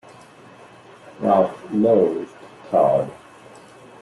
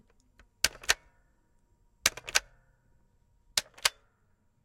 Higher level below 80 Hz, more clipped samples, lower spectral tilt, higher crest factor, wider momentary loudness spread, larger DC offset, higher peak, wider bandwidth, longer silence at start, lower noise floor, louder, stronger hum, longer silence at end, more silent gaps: about the same, -62 dBFS vs -60 dBFS; neither; first, -8 dB/octave vs 1.5 dB/octave; second, 18 dB vs 30 dB; first, 14 LU vs 5 LU; neither; about the same, -4 dBFS vs -6 dBFS; second, 11.5 kHz vs 16.5 kHz; first, 1.2 s vs 0.65 s; second, -45 dBFS vs -70 dBFS; first, -20 LUFS vs -30 LUFS; neither; first, 0.9 s vs 0.75 s; neither